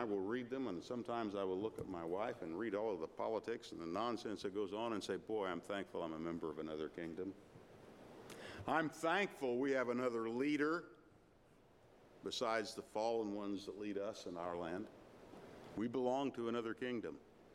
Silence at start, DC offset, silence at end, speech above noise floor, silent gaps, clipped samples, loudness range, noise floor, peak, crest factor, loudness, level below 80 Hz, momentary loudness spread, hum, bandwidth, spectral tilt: 0 s; under 0.1%; 0 s; 26 dB; none; under 0.1%; 5 LU; -68 dBFS; -22 dBFS; 22 dB; -42 LUFS; -76 dBFS; 15 LU; none; 15.5 kHz; -5 dB/octave